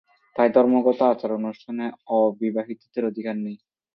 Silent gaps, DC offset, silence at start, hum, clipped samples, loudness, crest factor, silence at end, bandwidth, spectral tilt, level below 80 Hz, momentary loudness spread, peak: none; under 0.1%; 0.35 s; none; under 0.1%; -23 LUFS; 20 dB; 0.4 s; 5.8 kHz; -9.5 dB/octave; -72 dBFS; 13 LU; -4 dBFS